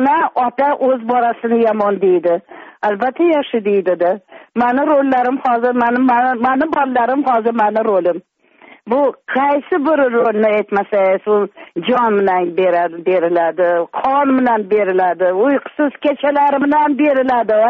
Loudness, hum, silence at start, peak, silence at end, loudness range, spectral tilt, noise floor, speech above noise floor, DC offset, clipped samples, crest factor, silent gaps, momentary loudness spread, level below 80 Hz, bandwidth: -15 LUFS; none; 0 s; -4 dBFS; 0 s; 2 LU; -4 dB/octave; -45 dBFS; 31 dB; under 0.1%; under 0.1%; 10 dB; none; 4 LU; -60 dBFS; 5.4 kHz